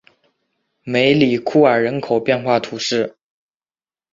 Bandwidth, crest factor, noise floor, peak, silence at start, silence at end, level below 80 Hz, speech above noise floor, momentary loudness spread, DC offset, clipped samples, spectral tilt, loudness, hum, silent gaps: 7.8 kHz; 18 dB; under -90 dBFS; -2 dBFS; 0.85 s; 1.05 s; -58 dBFS; over 74 dB; 8 LU; under 0.1%; under 0.1%; -5.5 dB/octave; -17 LUFS; none; none